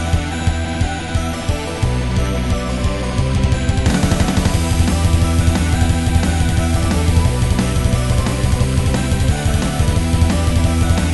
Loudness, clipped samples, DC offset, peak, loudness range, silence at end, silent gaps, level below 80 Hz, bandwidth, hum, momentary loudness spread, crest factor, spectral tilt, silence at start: -17 LUFS; under 0.1%; 1%; -2 dBFS; 3 LU; 0 s; none; -20 dBFS; 12 kHz; none; 4 LU; 14 dB; -5.5 dB/octave; 0 s